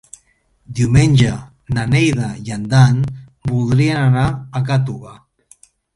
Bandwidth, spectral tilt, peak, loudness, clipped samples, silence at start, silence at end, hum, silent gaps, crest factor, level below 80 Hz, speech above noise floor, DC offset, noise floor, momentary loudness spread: 11.5 kHz; -6.5 dB/octave; 0 dBFS; -16 LUFS; under 0.1%; 0.7 s; 0.85 s; none; none; 16 dB; -38 dBFS; 43 dB; under 0.1%; -58 dBFS; 13 LU